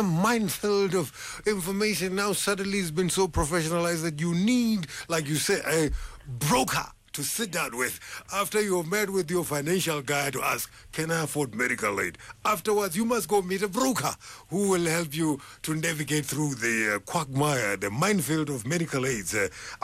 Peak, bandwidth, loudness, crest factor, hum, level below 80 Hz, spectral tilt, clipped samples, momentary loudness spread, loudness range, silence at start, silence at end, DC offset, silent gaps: -14 dBFS; 16 kHz; -27 LUFS; 14 dB; none; -48 dBFS; -4 dB/octave; under 0.1%; 6 LU; 1 LU; 0 s; 0.05 s; under 0.1%; none